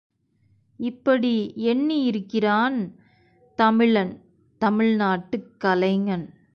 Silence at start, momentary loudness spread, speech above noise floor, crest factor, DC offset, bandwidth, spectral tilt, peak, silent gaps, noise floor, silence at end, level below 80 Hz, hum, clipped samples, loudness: 0.8 s; 11 LU; 42 dB; 16 dB; under 0.1%; 6.2 kHz; -8 dB/octave; -6 dBFS; none; -63 dBFS; 0.25 s; -64 dBFS; none; under 0.1%; -23 LUFS